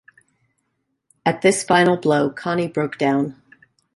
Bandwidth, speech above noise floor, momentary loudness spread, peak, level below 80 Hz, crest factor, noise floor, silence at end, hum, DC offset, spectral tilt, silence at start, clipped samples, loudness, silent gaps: 11.5 kHz; 55 dB; 8 LU; -2 dBFS; -62 dBFS; 20 dB; -73 dBFS; 0.65 s; none; under 0.1%; -5 dB/octave; 1.25 s; under 0.1%; -19 LUFS; none